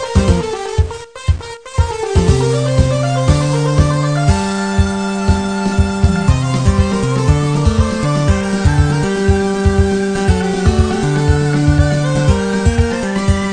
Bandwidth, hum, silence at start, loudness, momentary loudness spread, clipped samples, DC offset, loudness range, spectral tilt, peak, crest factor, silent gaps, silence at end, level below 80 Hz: 9.8 kHz; none; 0 s; -15 LUFS; 4 LU; under 0.1%; 0.5%; 1 LU; -6.5 dB/octave; 0 dBFS; 14 dB; none; 0 s; -20 dBFS